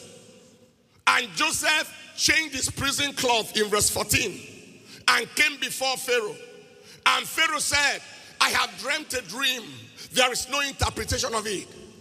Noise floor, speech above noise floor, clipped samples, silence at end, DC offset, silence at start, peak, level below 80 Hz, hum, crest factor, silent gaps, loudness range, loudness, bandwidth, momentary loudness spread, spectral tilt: -58 dBFS; 33 dB; under 0.1%; 0.1 s; under 0.1%; 0 s; -2 dBFS; -50 dBFS; none; 24 dB; none; 2 LU; -23 LUFS; 15.5 kHz; 12 LU; -1.5 dB/octave